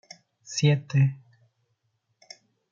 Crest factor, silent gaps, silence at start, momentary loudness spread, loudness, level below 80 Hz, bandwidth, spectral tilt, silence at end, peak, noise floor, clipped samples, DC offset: 20 dB; none; 0.5 s; 24 LU; -25 LUFS; -72 dBFS; 7.6 kHz; -6 dB/octave; 1.55 s; -8 dBFS; -75 dBFS; under 0.1%; under 0.1%